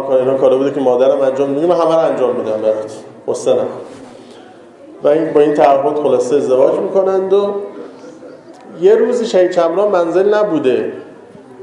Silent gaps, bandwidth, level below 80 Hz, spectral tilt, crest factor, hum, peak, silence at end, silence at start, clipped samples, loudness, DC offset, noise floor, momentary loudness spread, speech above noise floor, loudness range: none; 11 kHz; -64 dBFS; -6 dB/octave; 14 dB; none; 0 dBFS; 0 s; 0 s; under 0.1%; -13 LUFS; under 0.1%; -38 dBFS; 13 LU; 25 dB; 4 LU